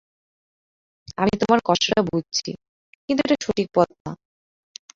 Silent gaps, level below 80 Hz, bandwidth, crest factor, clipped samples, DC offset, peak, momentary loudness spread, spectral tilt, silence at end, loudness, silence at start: 2.69-3.08 s, 4.00-4.05 s; -54 dBFS; 7.8 kHz; 22 dB; under 0.1%; under 0.1%; -2 dBFS; 18 LU; -4.5 dB/octave; 0.8 s; -21 LUFS; 1.1 s